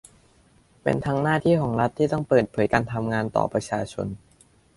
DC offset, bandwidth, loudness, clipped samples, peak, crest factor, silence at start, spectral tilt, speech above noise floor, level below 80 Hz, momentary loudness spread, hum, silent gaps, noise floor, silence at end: under 0.1%; 11.5 kHz; -24 LUFS; under 0.1%; -4 dBFS; 20 dB; 0.85 s; -7 dB/octave; 35 dB; -52 dBFS; 9 LU; none; none; -58 dBFS; 0.6 s